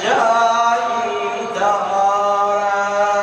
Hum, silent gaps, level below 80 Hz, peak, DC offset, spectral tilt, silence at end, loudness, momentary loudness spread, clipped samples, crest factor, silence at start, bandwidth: none; none; -64 dBFS; -4 dBFS; under 0.1%; -2.5 dB/octave; 0 s; -17 LUFS; 6 LU; under 0.1%; 14 dB; 0 s; 10 kHz